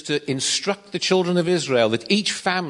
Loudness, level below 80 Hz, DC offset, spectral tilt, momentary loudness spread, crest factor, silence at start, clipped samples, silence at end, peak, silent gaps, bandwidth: -21 LUFS; -66 dBFS; under 0.1%; -3.5 dB/octave; 5 LU; 16 dB; 0.05 s; under 0.1%; 0 s; -4 dBFS; none; 11 kHz